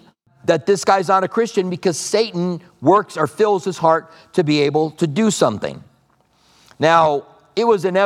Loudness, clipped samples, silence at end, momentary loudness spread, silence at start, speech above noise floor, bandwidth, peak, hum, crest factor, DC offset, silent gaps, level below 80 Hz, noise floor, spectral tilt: -18 LUFS; under 0.1%; 0 s; 8 LU; 0.45 s; 42 dB; 14.5 kHz; 0 dBFS; none; 18 dB; under 0.1%; none; -64 dBFS; -59 dBFS; -5 dB/octave